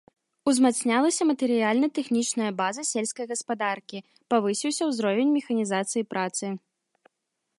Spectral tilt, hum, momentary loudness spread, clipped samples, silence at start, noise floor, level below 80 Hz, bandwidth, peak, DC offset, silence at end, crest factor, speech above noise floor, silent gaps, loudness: -3.5 dB/octave; none; 9 LU; under 0.1%; 0.45 s; -81 dBFS; -78 dBFS; 11.5 kHz; -8 dBFS; under 0.1%; 1 s; 18 dB; 56 dB; none; -25 LUFS